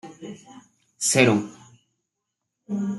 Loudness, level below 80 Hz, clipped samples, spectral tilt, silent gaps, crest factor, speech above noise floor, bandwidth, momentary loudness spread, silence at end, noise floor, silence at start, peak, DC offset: -21 LUFS; -68 dBFS; under 0.1%; -4 dB/octave; none; 24 dB; 60 dB; 12.5 kHz; 23 LU; 0 s; -82 dBFS; 0.05 s; -4 dBFS; under 0.1%